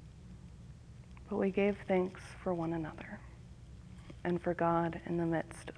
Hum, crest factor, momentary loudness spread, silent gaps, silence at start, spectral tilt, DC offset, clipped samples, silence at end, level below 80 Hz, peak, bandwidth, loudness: none; 18 dB; 22 LU; none; 0 s; -7.5 dB/octave; under 0.1%; under 0.1%; 0 s; -56 dBFS; -18 dBFS; 11 kHz; -35 LUFS